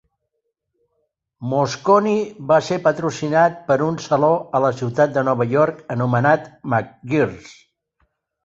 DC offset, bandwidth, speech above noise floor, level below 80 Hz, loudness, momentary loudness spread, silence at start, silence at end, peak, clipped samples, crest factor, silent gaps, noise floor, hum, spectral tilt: under 0.1%; 7.8 kHz; 57 dB; -58 dBFS; -19 LUFS; 7 LU; 1.4 s; 0.95 s; -2 dBFS; under 0.1%; 18 dB; none; -75 dBFS; none; -6.5 dB/octave